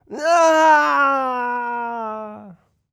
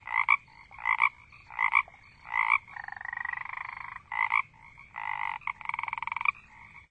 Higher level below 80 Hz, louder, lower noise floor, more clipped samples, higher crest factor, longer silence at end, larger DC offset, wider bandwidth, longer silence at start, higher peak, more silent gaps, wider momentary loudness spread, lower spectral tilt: about the same, -70 dBFS vs -66 dBFS; first, -17 LUFS vs -29 LUFS; second, -45 dBFS vs -53 dBFS; neither; second, 14 dB vs 24 dB; first, 0.4 s vs 0.1 s; neither; first, 14 kHz vs 9.2 kHz; about the same, 0.1 s vs 0.05 s; first, -4 dBFS vs -8 dBFS; neither; about the same, 16 LU vs 16 LU; about the same, -2.5 dB/octave vs -2.5 dB/octave